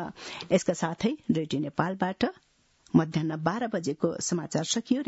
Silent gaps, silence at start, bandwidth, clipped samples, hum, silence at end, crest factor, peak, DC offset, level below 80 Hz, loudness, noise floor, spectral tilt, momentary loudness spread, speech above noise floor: none; 0 s; 8.2 kHz; under 0.1%; none; 0.05 s; 20 dB; -8 dBFS; under 0.1%; -64 dBFS; -29 LUFS; -61 dBFS; -5 dB/octave; 5 LU; 33 dB